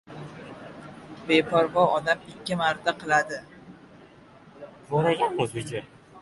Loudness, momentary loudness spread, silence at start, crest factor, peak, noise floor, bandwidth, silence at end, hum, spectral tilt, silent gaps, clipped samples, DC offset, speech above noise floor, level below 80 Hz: -25 LUFS; 21 LU; 0.1 s; 20 dB; -8 dBFS; -51 dBFS; 11.5 kHz; 0 s; none; -5 dB/octave; none; under 0.1%; under 0.1%; 27 dB; -62 dBFS